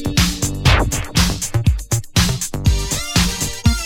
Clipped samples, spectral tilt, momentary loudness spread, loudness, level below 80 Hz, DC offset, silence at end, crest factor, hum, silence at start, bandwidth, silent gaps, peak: under 0.1%; -3.5 dB/octave; 4 LU; -18 LUFS; -22 dBFS; under 0.1%; 0 s; 16 dB; none; 0 s; 18 kHz; none; -2 dBFS